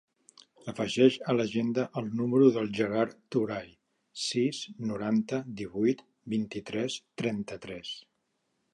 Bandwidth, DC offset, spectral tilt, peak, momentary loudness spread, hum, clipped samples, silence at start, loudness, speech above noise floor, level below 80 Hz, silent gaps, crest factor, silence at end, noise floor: 11.5 kHz; under 0.1%; -5.5 dB/octave; -8 dBFS; 15 LU; none; under 0.1%; 0.65 s; -30 LUFS; 49 dB; -68 dBFS; none; 22 dB; 0.75 s; -78 dBFS